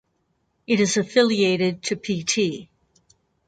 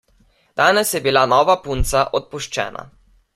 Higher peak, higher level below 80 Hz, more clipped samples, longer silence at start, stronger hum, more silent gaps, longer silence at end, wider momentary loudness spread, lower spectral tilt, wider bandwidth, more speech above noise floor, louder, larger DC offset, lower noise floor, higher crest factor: about the same, -4 dBFS vs -2 dBFS; second, -64 dBFS vs -34 dBFS; neither; first, 0.7 s vs 0.55 s; neither; neither; first, 0.85 s vs 0.5 s; second, 7 LU vs 12 LU; about the same, -4 dB/octave vs -3 dB/octave; second, 9.2 kHz vs 16 kHz; first, 49 dB vs 40 dB; second, -21 LUFS vs -18 LUFS; neither; first, -70 dBFS vs -57 dBFS; about the same, 20 dB vs 18 dB